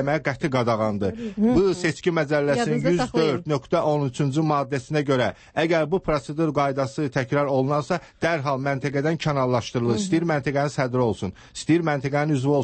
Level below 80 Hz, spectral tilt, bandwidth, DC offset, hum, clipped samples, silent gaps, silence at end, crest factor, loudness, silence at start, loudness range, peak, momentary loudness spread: -50 dBFS; -6.5 dB/octave; 8.8 kHz; under 0.1%; none; under 0.1%; none; 0 s; 14 dB; -23 LUFS; 0 s; 2 LU; -8 dBFS; 4 LU